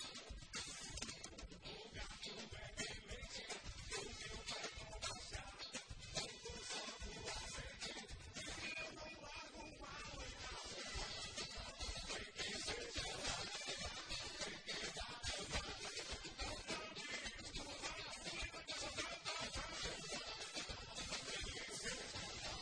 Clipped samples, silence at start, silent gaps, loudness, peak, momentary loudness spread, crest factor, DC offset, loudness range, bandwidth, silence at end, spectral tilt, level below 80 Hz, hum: under 0.1%; 0 s; none; -47 LUFS; -30 dBFS; 7 LU; 20 dB; under 0.1%; 4 LU; 10.5 kHz; 0 s; -2 dB/octave; -60 dBFS; none